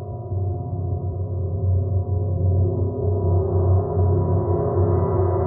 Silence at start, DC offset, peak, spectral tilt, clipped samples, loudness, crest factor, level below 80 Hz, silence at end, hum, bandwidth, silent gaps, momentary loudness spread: 0 s; under 0.1%; -8 dBFS; -15.5 dB/octave; under 0.1%; -22 LUFS; 12 dB; -40 dBFS; 0 s; none; 2.1 kHz; none; 7 LU